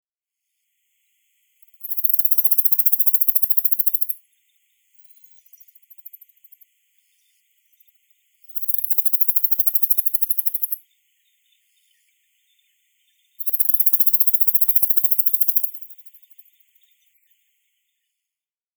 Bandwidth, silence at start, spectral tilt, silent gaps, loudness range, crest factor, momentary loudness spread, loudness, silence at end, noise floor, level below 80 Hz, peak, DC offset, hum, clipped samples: over 20 kHz; 1.8 s; 9 dB/octave; none; 11 LU; 22 dB; 12 LU; -15 LUFS; 2.65 s; -89 dBFS; under -90 dBFS; 0 dBFS; under 0.1%; none; under 0.1%